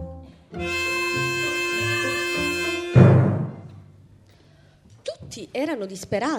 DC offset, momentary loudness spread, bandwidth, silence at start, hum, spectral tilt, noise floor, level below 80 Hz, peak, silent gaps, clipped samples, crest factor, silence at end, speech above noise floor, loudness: under 0.1%; 21 LU; 16.5 kHz; 0 s; none; -5.5 dB/octave; -53 dBFS; -48 dBFS; -2 dBFS; none; under 0.1%; 22 dB; 0 s; 27 dB; -22 LUFS